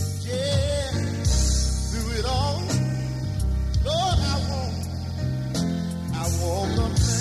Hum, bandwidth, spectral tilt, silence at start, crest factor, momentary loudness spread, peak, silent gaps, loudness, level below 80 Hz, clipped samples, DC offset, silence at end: none; 14 kHz; -5 dB/octave; 0 s; 14 dB; 6 LU; -10 dBFS; none; -25 LUFS; -30 dBFS; under 0.1%; under 0.1%; 0 s